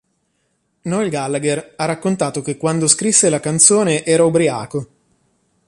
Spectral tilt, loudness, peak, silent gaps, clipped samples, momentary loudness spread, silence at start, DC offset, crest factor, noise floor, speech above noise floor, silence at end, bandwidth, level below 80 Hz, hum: -3.5 dB/octave; -15 LUFS; 0 dBFS; none; under 0.1%; 12 LU; 0.85 s; under 0.1%; 18 dB; -67 dBFS; 50 dB; 0.8 s; 12 kHz; -58 dBFS; none